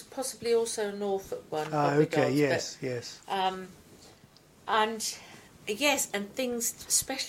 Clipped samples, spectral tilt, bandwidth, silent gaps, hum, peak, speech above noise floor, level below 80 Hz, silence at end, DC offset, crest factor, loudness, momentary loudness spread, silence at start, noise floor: under 0.1%; -3 dB/octave; 16.5 kHz; none; none; -12 dBFS; 28 dB; -66 dBFS; 0 s; under 0.1%; 20 dB; -29 LUFS; 12 LU; 0 s; -58 dBFS